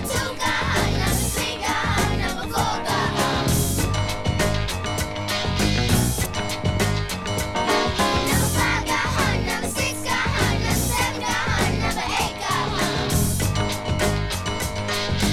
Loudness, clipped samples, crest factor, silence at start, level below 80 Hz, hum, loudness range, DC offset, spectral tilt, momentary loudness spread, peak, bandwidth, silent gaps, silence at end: -22 LUFS; under 0.1%; 16 dB; 0 s; -32 dBFS; none; 2 LU; under 0.1%; -4 dB/octave; 5 LU; -6 dBFS; 18.5 kHz; none; 0 s